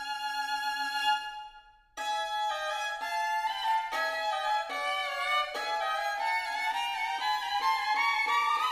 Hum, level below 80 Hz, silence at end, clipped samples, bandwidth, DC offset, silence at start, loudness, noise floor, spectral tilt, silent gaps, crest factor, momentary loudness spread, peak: none; -68 dBFS; 0 s; under 0.1%; 15.5 kHz; under 0.1%; 0 s; -30 LUFS; -55 dBFS; 1.5 dB/octave; none; 14 dB; 6 LU; -16 dBFS